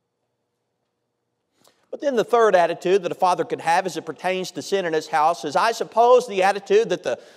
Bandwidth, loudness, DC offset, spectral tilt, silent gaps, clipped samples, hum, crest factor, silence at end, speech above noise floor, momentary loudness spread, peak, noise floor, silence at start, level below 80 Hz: 14.5 kHz; -20 LUFS; under 0.1%; -4 dB/octave; none; under 0.1%; none; 18 dB; 0.15 s; 55 dB; 10 LU; -4 dBFS; -76 dBFS; 1.9 s; -78 dBFS